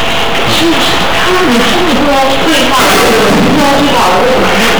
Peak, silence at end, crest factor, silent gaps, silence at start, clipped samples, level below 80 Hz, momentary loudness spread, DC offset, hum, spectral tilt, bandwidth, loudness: -4 dBFS; 0 s; 4 dB; none; 0 s; under 0.1%; -28 dBFS; 2 LU; 20%; none; -3.5 dB/octave; over 20 kHz; -7 LUFS